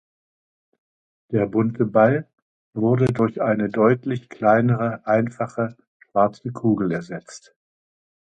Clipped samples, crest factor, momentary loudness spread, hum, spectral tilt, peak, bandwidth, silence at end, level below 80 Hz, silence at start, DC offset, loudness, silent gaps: under 0.1%; 18 dB; 10 LU; none; -8.5 dB/octave; -4 dBFS; 9.2 kHz; 0.9 s; -58 dBFS; 1.3 s; under 0.1%; -21 LUFS; 2.42-2.73 s, 5.87-6.00 s